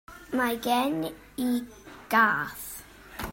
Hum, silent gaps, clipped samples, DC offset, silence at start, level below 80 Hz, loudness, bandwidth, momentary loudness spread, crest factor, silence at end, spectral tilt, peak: none; none; under 0.1%; under 0.1%; 0.1 s; -54 dBFS; -27 LUFS; 16.5 kHz; 20 LU; 20 dB; 0 s; -4 dB/octave; -8 dBFS